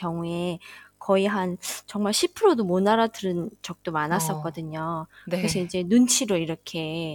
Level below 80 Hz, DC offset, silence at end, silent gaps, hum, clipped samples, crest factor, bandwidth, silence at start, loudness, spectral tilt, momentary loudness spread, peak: -60 dBFS; under 0.1%; 0 s; none; none; under 0.1%; 18 dB; 19 kHz; 0 s; -25 LUFS; -4.5 dB/octave; 12 LU; -8 dBFS